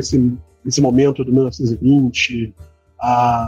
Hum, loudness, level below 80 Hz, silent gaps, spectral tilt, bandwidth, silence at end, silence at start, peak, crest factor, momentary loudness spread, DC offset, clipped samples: none; -16 LUFS; -42 dBFS; none; -5.5 dB/octave; 9.2 kHz; 0 s; 0 s; -4 dBFS; 12 dB; 10 LU; under 0.1%; under 0.1%